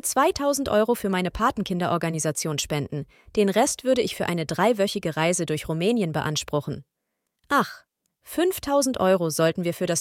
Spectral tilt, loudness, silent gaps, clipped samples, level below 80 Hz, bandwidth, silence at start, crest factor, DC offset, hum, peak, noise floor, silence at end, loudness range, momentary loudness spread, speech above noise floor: -4.5 dB/octave; -24 LUFS; none; under 0.1%; -52 dBFS; 17 kHz; 0.05 s; 18 dB; under 0.1%; none; -6 dBFS; -80 dBFS; 0 s; 3 LU; 7 LU; 56 dB